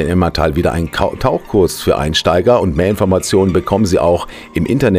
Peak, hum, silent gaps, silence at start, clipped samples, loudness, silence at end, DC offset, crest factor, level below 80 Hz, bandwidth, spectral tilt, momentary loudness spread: 0 dBFS; none; none; 0 s; under 0.1%; -14 LUFS; 0 s; under 0.1%; 12 dB; -30 dBFS; 16 kHz; -6 dB/octave; 5 LU